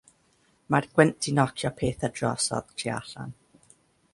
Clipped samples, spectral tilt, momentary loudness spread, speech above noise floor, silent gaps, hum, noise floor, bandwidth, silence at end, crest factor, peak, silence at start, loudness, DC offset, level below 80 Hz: under 0.1%; -5 dB/octave; 14 LU; 39 dB; none; none; -66 dBFS; 11.5 kHz; 0.8 s; 24 dB; -4 dBFS; 0.7 s; -26 LUFS; under 0.1%; -56 dBFS